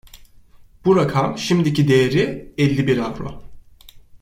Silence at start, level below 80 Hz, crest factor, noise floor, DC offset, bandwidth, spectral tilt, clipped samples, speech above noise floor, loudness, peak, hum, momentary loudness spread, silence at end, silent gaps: 0.15 s; -46 dBFS; 16 dB; -46 dBFS; under 0.1%; 16 kHz; -6.5 dB/octave; under 0.1%; 29 dB; -18 LUFS; -4 dBFS; none; 9 LU; 0.05 s; none